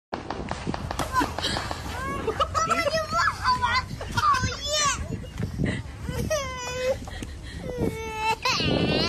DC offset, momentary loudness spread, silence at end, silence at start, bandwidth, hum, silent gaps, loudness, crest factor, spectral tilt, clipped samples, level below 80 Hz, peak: under 0.1%; 10 LU; 0 s; 0.1 s; 14 kHz; none; none; -26 LUFS; 16 dB; -3.5 dB/octave; under 0.1%; -40 dBFS; -12 dBFS